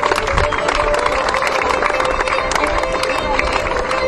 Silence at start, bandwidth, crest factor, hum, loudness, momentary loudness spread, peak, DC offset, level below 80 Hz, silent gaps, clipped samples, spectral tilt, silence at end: 0 s; 14.5 kHz; 16 dB; none; -16 LUFS; 2 LU; 0 dBFS; under 0.1%; -28 dBFS; none; under 0.1%; -3.5 dB/octave; 0 s